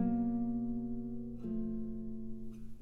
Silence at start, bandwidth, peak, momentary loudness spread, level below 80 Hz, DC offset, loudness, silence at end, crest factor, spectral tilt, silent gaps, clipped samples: 0 s; 2.7 kHz; -22 dBFS; 12 LU; -52 dBFS; under 0.1%; -39 LUFS; 0 s; 14 dB; -11 dB/octave; none; under 0.1%